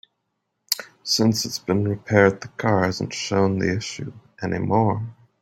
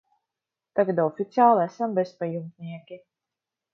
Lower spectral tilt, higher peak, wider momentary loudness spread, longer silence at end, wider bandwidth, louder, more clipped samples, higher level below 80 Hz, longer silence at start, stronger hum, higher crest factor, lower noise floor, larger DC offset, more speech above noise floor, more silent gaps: second, -5 dB/octave vs -8.5 dB/octave; first, -2 dBFS vs -6 dBFS; second, 12 LU vs 19 LU; second, 0.3 s vs 0.75 s; first, 16.5 kHz vs 6.6 kHz; about the same, -22 LUFS vs -24 LUFS; neither; first, -58 dBFS vs -78 dBFS; about the same, 0.7 s vs 0.75 s; neither; about the same, 22 dB vs 20 dB; second, -76 dBFS vs -88 dBFS; neither; second, 55 dB vs 64 dB; neither